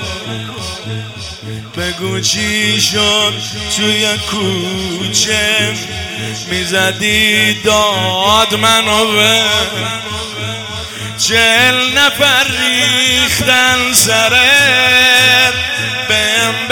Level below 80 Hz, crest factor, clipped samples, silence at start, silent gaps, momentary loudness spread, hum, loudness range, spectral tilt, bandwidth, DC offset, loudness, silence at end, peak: -42 dBFS; 12 dB; 0.4%; 0 s; none; 15 LU; none; 6 LU; -2 dB/octave; over 20 kHz; under 0.1%; -10 LUFS; 0 s; 0 dBFS